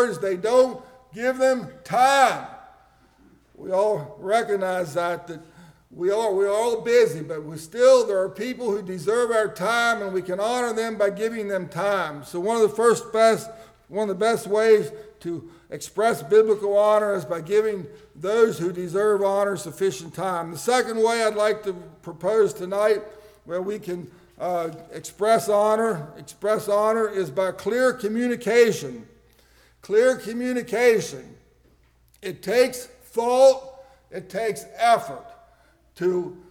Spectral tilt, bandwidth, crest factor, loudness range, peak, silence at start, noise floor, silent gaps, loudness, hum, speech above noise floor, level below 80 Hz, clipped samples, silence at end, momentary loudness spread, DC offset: -4.5 dB/octave; 17 kHz; 16 dB; 3 LU; -6 dBFS; 0 s; -59 dBFS; none; -22 LUFS; none; 37 dB; -62 dBFS; under 0.1%; 0.15 s; 15 LU; under 0.1%